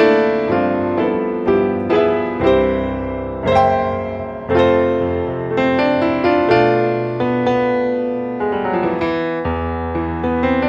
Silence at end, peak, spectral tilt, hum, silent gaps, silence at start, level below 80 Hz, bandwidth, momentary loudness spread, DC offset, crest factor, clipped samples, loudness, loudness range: 0 s; -2 dBFS; -8 dB/octave; none; none; 0 s; -38 dBFS; 7.2 kHz; 8 LU; under 0.1%; 14 dB; under 0.1%; -17 LUFS; 3 LU